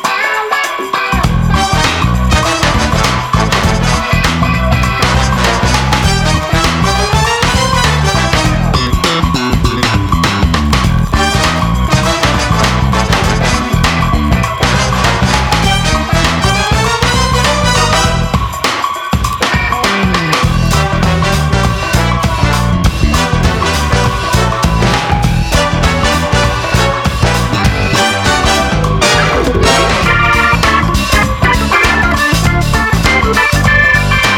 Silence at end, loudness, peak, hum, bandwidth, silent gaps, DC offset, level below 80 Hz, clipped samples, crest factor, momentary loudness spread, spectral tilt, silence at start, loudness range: 0 s; -11 LUFS; 0 dBFS; none; 18.5 kHz; none; under 0.1%; -18 dBFS; under 0.1%; 10 dB; 3 LU; -4.5 dB/octave; 0 s; 2 LU